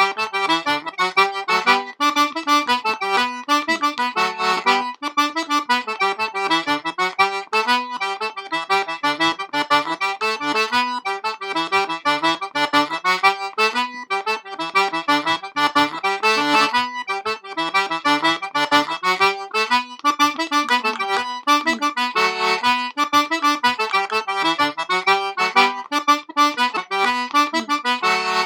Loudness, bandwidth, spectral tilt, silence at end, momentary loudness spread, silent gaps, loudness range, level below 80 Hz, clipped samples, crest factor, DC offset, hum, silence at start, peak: -19 LUFS; 19.5 kHz; -2 dB/octave; 0 s; 5 LU; none; 2 LU; -74 dBFS; under 0.1%; 20 dB; under 0.1%; none; 0 s; 0 dBFS